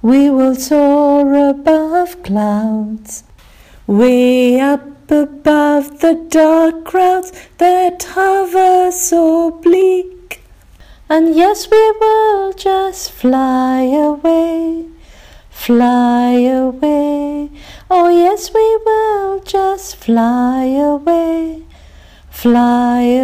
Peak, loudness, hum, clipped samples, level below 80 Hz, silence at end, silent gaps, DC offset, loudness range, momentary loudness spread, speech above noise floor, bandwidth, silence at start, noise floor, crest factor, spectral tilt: -2 dBFS; -12 LUFS; none; under 0.1%; -42 dBFS; 0 s; none; under 0.1%; 3 LU; 10 LU; 29 dB; 16 kHz; 0.05 s; -41 dBFS; 10 dB; -5 dB/octave